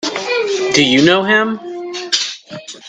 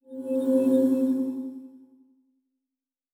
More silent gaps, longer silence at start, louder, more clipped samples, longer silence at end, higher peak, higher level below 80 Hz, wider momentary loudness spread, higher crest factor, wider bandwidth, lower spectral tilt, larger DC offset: neither; about the same, 0 s vs 0.1 s; first, -13 LUFS vs -25 LUFS; neither; second, 0 s vs 1.35 s; first, 0 dBFS vs -12 dBFS; first, -58 dBFS vs -82 dBFS; about the same, 15 LU vs 16 LU; about the same, 16 dB vs 16 dB; second, 9.6 kHz vs 15 kHz; second, -3 dB/octave vs -7.5 dB/octave; neither